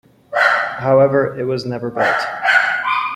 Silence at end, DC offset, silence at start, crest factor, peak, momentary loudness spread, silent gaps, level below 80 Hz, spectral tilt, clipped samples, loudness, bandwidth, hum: 0 s; under 0.1%; 0.3 s; 16 dB; -2 dBFS; 9 LU; none; -58 dBFS; -5.5 dB/octave; under 0.1%; -16 LUFS; 13 kHz; none